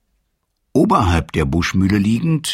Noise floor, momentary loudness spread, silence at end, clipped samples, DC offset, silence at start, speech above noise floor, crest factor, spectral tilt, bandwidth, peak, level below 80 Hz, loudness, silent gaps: -69 dBFS; 4 LU; 0 s; under 0.1%; under 0.1%; 0.75 s; 53 dB; 16 dB; -6 dB/octave; 16 kHz; 0 dBFS; -32 dBFS; -17 LUFS; none